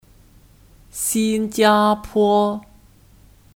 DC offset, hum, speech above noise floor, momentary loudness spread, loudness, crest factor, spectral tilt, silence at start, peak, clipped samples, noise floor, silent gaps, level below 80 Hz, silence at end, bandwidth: under 0.1%; none; 32 dB; 10 LU; -18 LUFS; 18 dB; -4 dB/octave; 0.95 s; -4 dBFS; under 0.1%; -50 dBFS; none; -50 dBFS; 0.95 s; 18 kHz